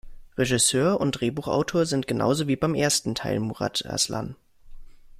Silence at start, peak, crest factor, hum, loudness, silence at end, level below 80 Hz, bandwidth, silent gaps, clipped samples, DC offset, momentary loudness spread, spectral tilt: 0.05 s; -8 dBFS; 18 dB; none; -24 LUFS; 0.25 s; -50 dBFS; 15.5 kHz; none; under 0.1%; under 0.1%; 8 LU; -4 dB/octave